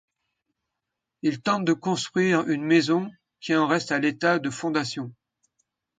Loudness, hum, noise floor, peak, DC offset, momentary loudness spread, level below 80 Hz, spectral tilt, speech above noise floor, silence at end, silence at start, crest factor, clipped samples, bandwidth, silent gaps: -24 LUFS; none; -84 dBFS; -8 dBFS; under 0.1%; 10 LU; -70 dBFS; -5 dB/octave; 60 dB; 0.85 s; 1.25 s; 18 dB; under 0.1%; 9.4 kHz; none